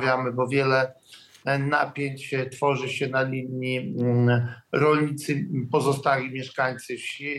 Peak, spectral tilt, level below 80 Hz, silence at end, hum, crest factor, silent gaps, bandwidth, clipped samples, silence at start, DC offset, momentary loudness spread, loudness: -8 dBFS; -6 dB/octave; -74 dBFS; 0 s; none; 16 dB; none; 12.5 kHz; under 0.1%; 0 s; under 0.1%; 8 LU; -25 LUFS